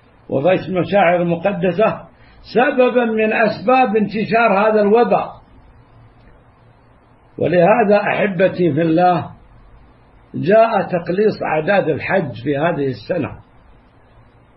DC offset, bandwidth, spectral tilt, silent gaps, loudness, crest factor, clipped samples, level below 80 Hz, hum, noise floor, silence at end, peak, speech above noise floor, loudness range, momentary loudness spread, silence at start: under 0.1%; 5.8 kHz; -11 dB/octave; none; -16 LUFS; 16 dB; under 0.1%; -50 dBFS; none; -49 dBFS; 1.2 s; 0 dBFS; 34 dB; 4 LU; 9 LU; 0.3 s